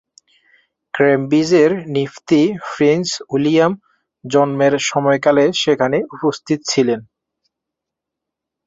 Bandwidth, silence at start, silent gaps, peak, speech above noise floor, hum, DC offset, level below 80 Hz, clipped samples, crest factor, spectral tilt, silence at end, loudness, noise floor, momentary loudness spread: 8 kHz; 0.95 s; none; -2 dBFS; 67 dB; none; under 0.1%; -60 dBFS; under 0.1%; 16 dB; -5 dB/octave; 1.65 s; -16 LUFS; -82 dBFS; 8 LU